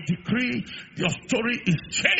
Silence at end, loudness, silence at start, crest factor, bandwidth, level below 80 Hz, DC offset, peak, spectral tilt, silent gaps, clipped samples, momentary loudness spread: 0 s; -25 LUFS; 0 s; 24 dB; 8 kHz; -56 dBFS; under 0.1%; -2 dBFS; -3.5 dB/octave; none; under 0.1%; 5 LU